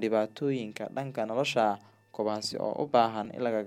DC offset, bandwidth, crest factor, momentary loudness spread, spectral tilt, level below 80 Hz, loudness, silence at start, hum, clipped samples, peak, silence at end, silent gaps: under 0.1%; 15.5 kHz; 18 dB; 10 LU; -5 dB/octave; -78 dBFS; -30 LUFS; 0 s; none; under 0.1%; -12 dBFS; 0 s; none